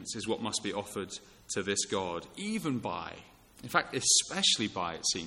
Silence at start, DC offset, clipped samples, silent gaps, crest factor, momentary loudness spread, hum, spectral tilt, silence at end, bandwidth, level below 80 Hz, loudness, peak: 0 s; under 0.1%; under 0.1%; none; 22 dB; 16 LU; none; -2 dB/octave; 0 s; 16.5 kHz; -66 dBFS; -31 LUFS; -10 dBFS